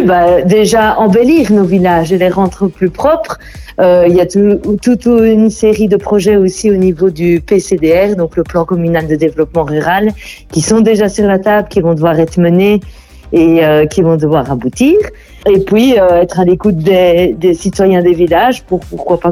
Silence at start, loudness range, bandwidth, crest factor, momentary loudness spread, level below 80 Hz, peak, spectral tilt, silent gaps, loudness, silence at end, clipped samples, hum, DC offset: 0 s; 2 LU; 16 kHz; 10 dB; 6 LU; -34 dBFS; 0 dBFS; -6.5 dB/octave; none; -10 LUFS; 0 s; under 0.1%; none; under 0.1%